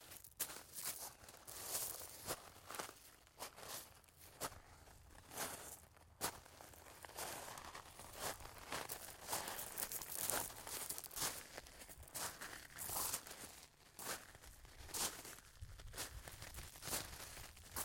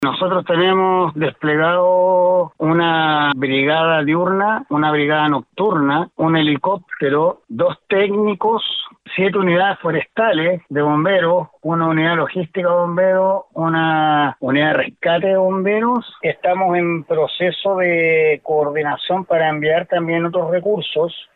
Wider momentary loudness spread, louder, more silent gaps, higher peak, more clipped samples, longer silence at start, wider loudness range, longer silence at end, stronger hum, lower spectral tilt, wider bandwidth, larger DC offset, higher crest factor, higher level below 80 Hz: first, 16 LU vs 6 LU; second, -47 LUFS vs -17 LUFS; neither; second, -14 dBFS vs -4 dBFS; neither; about the same, 0 s vs 0 s; first, 6 LU vs 2 LU; about the same, 0 s vs 0.1 s; neither; second, -1 dB/octave vs -8.5 dB/octave; first, 17 kHz vs 4.3 kHz; neither; first, 36 dB vs 12 dB; about the same, -66 dBFS vs -64 dBFS